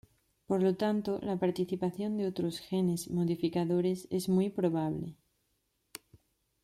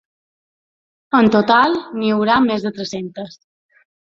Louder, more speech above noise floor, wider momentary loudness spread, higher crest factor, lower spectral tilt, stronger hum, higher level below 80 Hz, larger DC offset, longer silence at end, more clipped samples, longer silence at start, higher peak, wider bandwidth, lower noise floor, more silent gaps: second, -32 LUFS vs -16 LUFS; second, 47 dB vs over 74 dB; second, 10 LU vs 16 LU; about the same, 16 dB vs 16 dB; first, -7 dB/octave vs -5.5 dB/octave; neither; second, -68 dBFS vs -56 dBFS; neither; first, 1.5 s vs 0.75 s; neither; second, 0.5 s vs 1.15 s; second, -16 dBFS vs -2 dBFS; first, 14 kHz vs 7.4 kHz; second, -78 dBFS vs under -90 dBFS; neither